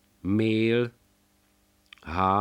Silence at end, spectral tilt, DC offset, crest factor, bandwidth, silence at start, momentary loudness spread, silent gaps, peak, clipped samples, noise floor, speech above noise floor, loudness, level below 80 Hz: 0 s; -8 dB/octave; under 0.1%; 18 dB; 10.5 kHz; 0.25 s; 11 LU; none; -10 dBFS; under 0.1%; -66 dBFS; 42 dB; -26 LUFS; -54 dBFS